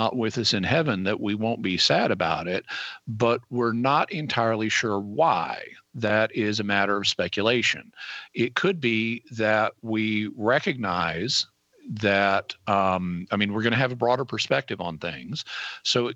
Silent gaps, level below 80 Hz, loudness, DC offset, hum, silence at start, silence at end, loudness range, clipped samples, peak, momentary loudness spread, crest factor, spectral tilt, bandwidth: none; -62 dBFS; -25 LUFS; under 0.1%; none; 0 s; 0 s; 1 LU; under 0.1%; -6 dBFS; 10 LU; 18 dB; -4.5 dB/octave; 8.4 kHz